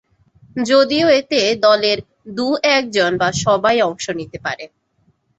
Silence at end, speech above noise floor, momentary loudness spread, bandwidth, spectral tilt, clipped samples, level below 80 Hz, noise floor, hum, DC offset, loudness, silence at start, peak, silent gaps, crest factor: 0.75 s; 45 dB; 12 LU; 8.2 kHz; -3.5 dB/octave; under 0.1%; -54 dBFS; -61 dBFS; none; under 0.1%; -16 LUFS; 0.55 s; -2 dBFS; none; 16 dB